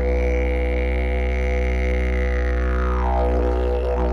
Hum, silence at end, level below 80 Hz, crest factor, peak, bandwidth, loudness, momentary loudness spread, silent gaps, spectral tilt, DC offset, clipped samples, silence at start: none; 0 s; -22 dBFS; 10 dB; -10 dBFS; 6.4 kHz; -22 LUFS; 2 LU; none; -8 dB/octave; under 0.1%; under 0.1%; 0 s